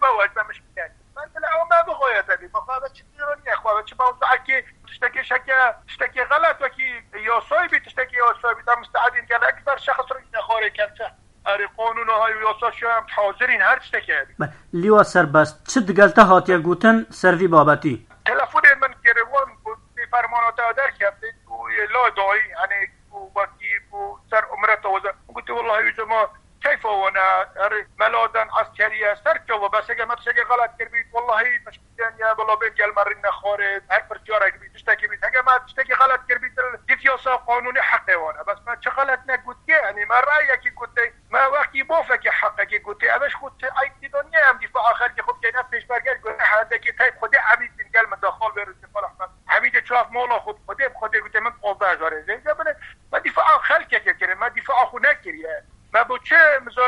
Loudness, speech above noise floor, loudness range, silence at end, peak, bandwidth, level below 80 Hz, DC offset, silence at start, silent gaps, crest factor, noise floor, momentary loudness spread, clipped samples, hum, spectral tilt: -19 LUFS; 22 dB; 6 LU; 0 s; 0 dBFS; 11.5 kHz; -54 dBFS; under 0.1%; 0 s; none; 20 dB; -39 dBFS; 11 LU; under 0.1%; none; -5 dB/octave